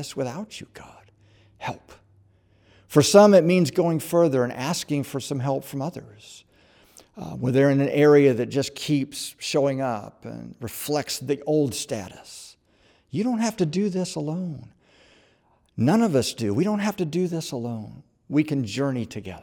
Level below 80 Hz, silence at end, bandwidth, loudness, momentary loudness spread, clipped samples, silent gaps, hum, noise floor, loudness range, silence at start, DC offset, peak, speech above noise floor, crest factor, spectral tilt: -64 dBFS; 0 s; over 20 kHz; -23 LUFS; 21 LU; under 0.1%; none; none; -63 dBFS; 9 LU; 0 s; under 0.1%; -2 dBFS; 40 dB; 22 dB; -5.5 dB/octave